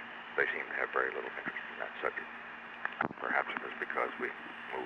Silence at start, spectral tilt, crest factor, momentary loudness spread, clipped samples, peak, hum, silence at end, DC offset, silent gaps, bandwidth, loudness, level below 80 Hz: 0 s; -5.5 dB/octave; 24 dB; 9 LU; under 0.1%; -14 dBFS; 60 Hz at -75 dBFS; 0 s; under 0.1%; none; 10 kHz; -36 LUFS; -76 dBFS